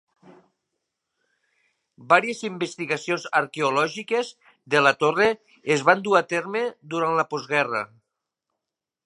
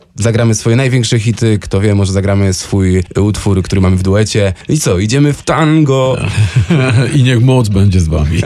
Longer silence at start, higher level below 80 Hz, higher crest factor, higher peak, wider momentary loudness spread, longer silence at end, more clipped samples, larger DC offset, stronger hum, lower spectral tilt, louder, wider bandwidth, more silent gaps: first, 2 s vs 0.15 s; second, -72 dBFS vs -28 dBFS; first, 24 dB vs 10 dB; about the same, -2 dBFS vs -2 dBFS; first, 10 LU vs 4 LU; first, 1.2 s vs 0 s; neither; neither; neither; second, -4 dB/octave vs -6 dB/octave; second, -23 LUFS vs -11 LUFS; second, 11.5 kHz vs 13 kHz; neither